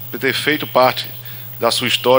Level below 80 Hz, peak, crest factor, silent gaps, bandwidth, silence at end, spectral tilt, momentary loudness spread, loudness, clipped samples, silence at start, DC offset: -60 dBFS; 0 dBFS; 16 dB; none; 16.5 kHz; 0 s; -3.5 dB/octave; 12 LU; -17 LUFS; under 0.1%; 0 s; under 0.1%